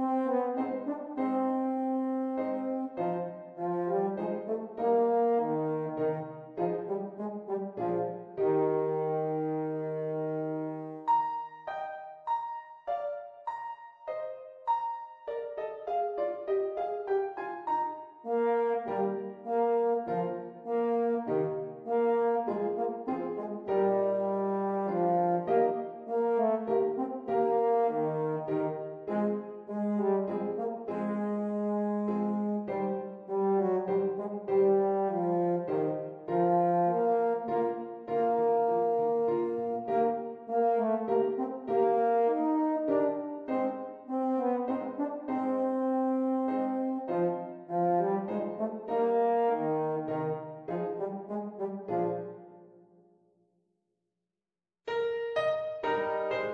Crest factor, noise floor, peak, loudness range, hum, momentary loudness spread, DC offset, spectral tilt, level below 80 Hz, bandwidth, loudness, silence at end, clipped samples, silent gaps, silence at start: 14 dB; under -90 dBFS; -16 dBFS; 7 LU; none; 10 LU; under 0.1%; -9.5 dB/octave; -78 dBFS; 5 kHz; -31 LUFS; 0 s; under 0.1%; none; 0 s